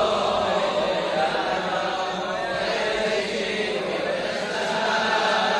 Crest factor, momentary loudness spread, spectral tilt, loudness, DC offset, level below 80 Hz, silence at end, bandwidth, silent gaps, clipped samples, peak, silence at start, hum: 14 dB; 5 LU; -3.5 dB/octave; -24 LUFS; under 0.1%; -56 dBFS; 0 s; 12 kHz; none; under 0.1%; -10 dBFS; 0 s; none